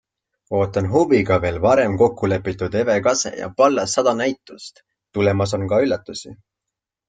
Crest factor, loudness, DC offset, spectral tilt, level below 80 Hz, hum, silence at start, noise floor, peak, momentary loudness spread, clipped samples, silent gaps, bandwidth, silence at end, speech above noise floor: 18 dB; -19 LUFS; under 0.1%; -5 dB/octave; -50 dBFS; none; 0.5 s; -84 dBFS; -2 dBFS; 14 LU; under 0.1%; none; 9.4 kHz; 0.75 s; 65 dB